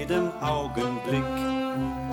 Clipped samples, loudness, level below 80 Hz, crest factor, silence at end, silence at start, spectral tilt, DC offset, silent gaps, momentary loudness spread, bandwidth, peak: under 0.1%; -28 LUFS; -46 dBFS; 14 dB; 0 s; 0 s; -6.5 dB/octave; under 0.1%; none; 2 LU; 19 kHz; -12 dBFS